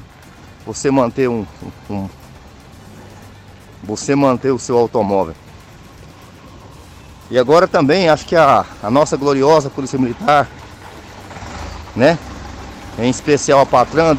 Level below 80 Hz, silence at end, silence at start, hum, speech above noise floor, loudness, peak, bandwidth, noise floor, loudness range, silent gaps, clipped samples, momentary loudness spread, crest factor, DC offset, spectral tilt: -42 dBFS; 0 s; 0 s; none; 26 dB; -15 LUFS; -2 dBFS; 15 kHz; -40 dBFS; 8 LU; none; under 0.1%; 21 LU; 14 dB; under 0.1%; -5.5 dB/octave